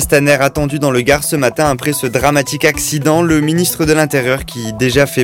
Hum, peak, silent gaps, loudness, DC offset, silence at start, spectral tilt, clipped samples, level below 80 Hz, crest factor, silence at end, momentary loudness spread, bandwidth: none; 0 dBFS; none; -13 LUFS; under 0.1%; 0 s; -4.5 dB/octave; under 0.1%; -34 dBFS; 12 dB; 0 s; 4 LU; 17.5 kHz